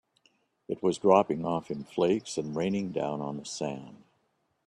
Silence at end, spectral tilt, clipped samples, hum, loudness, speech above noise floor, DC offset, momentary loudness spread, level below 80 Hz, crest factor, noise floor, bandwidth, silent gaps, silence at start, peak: 0.75 s; -6 dB/octave; under 0.1%; none; -29 LUFS; 46 dB; under 0.1%; 13 LU; -68 dBFS; 24 dB; -74 dBFS; 11.5 kHz; none; 0.7 s; -6 dBFS